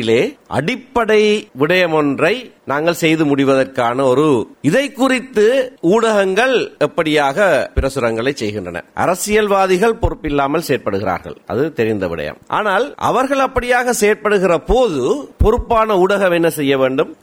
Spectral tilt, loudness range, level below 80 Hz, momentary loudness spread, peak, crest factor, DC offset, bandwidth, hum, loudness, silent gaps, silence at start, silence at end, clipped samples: -5 dB/octave; 3 LU; -32 dBFS; 7 LU; -2 dBFS; 12 dB; under 0.1%; 17 kHz; none; -15 LUFS; none; 0 s; 0.1 s; under 0.1%